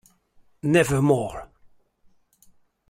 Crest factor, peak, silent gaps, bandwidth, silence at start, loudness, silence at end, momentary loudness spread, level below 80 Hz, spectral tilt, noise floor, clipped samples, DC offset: 20 dB; -6 dBFS; none; 16 kHz; 0.65 s; -22 LUFS; 1.45 s; 14 LU; -52 dBFS; -6 dB/octave; -60 dBFS; under 0.1%; under 0.1%